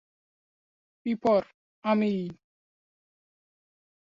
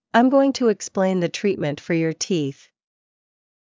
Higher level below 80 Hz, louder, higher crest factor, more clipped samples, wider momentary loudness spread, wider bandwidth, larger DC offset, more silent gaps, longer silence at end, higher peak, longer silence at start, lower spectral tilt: about the same, -70 dBFS vs -66 dBFS; second, -28 LUFS vs -21 LUFS; about the same, 20 dB vs 18 dB; neither; first, 12 LU vs 7 LU; about the same, 7.4 kHz vs 7.6 kHz; neither; first, 1.54-1.82 s vs none; first, 1.85 s vs 1.15 s; second, -12 dBFS vs -4 dBFS; first, 1.05 s vs 0.15 s; first, -8 dB/octave vs -5.5 dB/octave